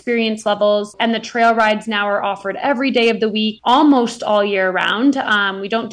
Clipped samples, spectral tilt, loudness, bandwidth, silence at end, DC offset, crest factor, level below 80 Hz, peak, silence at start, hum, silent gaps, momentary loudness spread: under 0.1%; -4.5 dB/octave; -16 LUFS; 10 kHz; 0 s; under 0.1%; 12 dB; -60 dBFS; -4 dBFS; 0.05 s; none; none; 6 LU